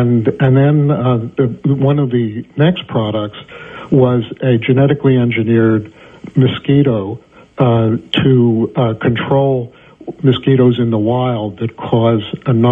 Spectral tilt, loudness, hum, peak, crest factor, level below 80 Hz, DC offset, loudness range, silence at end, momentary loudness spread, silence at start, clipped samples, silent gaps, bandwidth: -10 dB/octave; -14 LUFS; none; 0 dBFS; 12 dB; -48 dBFS; under 0.1%; 2 LU; 0 s; 10 LU; 0 s; under 0.1%; none; 3.8 kHz